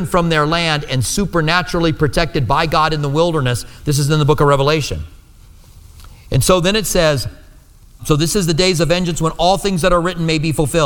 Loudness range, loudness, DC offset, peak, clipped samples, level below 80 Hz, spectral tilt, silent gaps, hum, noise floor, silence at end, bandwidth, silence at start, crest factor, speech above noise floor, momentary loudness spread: 2 LU; -15 LUFS; under 0.1%; 0 dBFS; under 0.1%; -30 dBFS; -5 dB/octave; none; none; -43 dBFS; 0 s; 19 kHz; 0 s; 16 dB; 28 dB; 6 LU